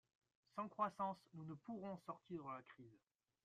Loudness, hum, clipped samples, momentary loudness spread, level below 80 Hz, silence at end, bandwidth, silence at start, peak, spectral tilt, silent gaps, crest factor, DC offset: -50 LUFS; none; under 0.1%; 15 LU; -88 dBFS; 0.5 s; 13 kHz; 0.55 s; -30 dBFS; -7.5 dB/octave; none; 22 dB; under 0.1%